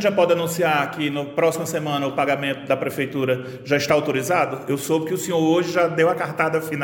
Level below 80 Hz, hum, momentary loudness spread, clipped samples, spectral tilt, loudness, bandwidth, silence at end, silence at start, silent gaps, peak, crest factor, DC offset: -62 dBFS; none; 5 LU; under 0.1%; -5 dB/octave; -21 LUFS; 17 kHz; 0 s; 0 s; none; -4 dBFS; 18 dB; under 0.1%